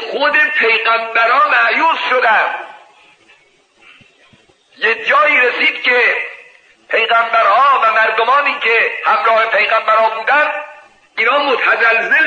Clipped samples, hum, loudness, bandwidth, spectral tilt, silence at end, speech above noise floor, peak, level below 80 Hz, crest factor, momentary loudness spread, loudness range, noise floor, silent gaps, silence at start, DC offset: under 0.1%; none; -12 LUFS; 9 kHz; -2 dB/octave; 0 s; 39 dB; -2 dBFS; -72 dBFS; 12 dB; 7 LU; 5 LU; -52 dBFS; none; 0 s; under 0.1%